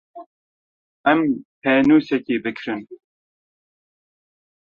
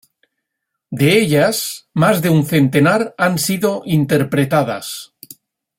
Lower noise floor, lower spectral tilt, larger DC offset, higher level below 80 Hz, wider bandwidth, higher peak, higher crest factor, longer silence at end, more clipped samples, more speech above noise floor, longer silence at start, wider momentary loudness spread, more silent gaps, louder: first, under -90 dBFS vs -77 dBFS; first, -7.5 dB/octave vs -5.5 dB/octave; neither; second, -62 dBFS vs -54 dBFS; second, 6.8 kHz vs 16.5 kHz; about the same, -2 dBFS vs -2 dBFS; about the same, 20 dB vs 16 dB; first, 1.75 s vs 0.75 s; neither; first, over 72 dB vs 63 dB; second, 0.15 s vs 0.9 s; first, 14 LU vs 11 LU; first, 0.26-1.04 s, 1.45-1.62 s vs none; second, -19 LUFS vs -15 LUFS